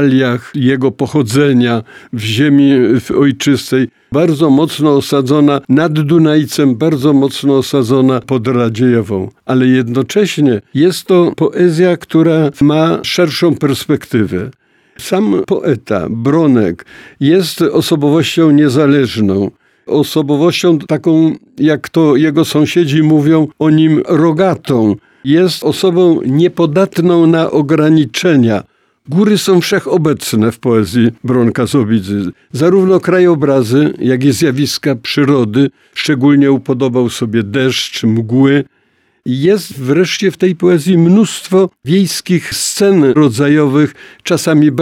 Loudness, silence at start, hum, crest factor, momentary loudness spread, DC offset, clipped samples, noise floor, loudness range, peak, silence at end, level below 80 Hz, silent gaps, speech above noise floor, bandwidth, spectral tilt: -11 LUFS; 0 s; none; 10 dB; 6 LU; under 0.1%; under 0.1%; -56 dBFS; 2 LU; 0 dBFS; 0 s; -52 dBFS; none; 46 dB; 16 kHz; -6 dB/octave